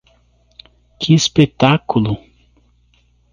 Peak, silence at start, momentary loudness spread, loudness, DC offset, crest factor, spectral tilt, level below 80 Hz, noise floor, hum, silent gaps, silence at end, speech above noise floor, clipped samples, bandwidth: 0 dBFS; 1 s; 11 LU; -15 LUFS; under 0.1%; 18 dB; -5.5 dB/octave; -46 dBFS; -56 dBFS; 60 Hz at -40 dBFS; none; 1.15 s; 42 dB; under 0.1%; 9.8 kHz